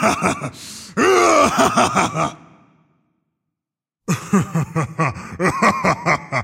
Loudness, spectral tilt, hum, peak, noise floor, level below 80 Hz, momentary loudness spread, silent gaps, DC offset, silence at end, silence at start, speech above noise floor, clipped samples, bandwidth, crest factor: -18 LUFS; -4.5 dB/octave; none; -2 dBFS; -86 dBFS; -50 dBFS; 12 LU; none; under 0.1%; 0 s; 0 s; 68 dB; under 0.1%; 16 kHz; 18 dB